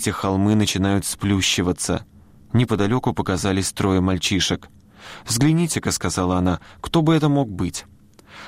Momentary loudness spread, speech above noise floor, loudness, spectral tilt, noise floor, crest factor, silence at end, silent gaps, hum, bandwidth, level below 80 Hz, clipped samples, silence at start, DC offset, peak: 8 LU; 24 dB; -20 LUFS; -5 dB/octave; -44 dBFS; 14 dB; 0 s; none; none; 16 kHz; -44 dBFS; under 0.1%; 0 s; under 0.1%; -8 dBFS